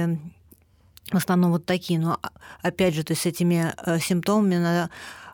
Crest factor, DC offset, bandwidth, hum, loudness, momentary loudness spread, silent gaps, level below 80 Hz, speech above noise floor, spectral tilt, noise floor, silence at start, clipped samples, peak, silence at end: 14 dB; under 0.1%; 19 kHz; none; -24 LUFS; 11 LU; none; -58 dBFS; 32 dB; -6 dB/octave; -56 dBFS; 0 s; under 0.1%; -10 dBFS; 0 s